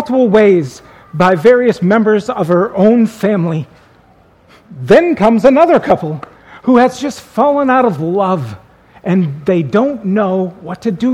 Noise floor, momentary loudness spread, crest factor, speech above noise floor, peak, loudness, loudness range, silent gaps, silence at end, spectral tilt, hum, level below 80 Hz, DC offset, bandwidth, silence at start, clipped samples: -47 dBFS; 13 LU; 12 dB; 35 dB; 0 dBFS; -12 LUFS; 3 LU; none; 0 s; -7.5 dB/octave; none; -48 dBFS; under 0.1%; 13.5 kHz; 0 s; 0.2%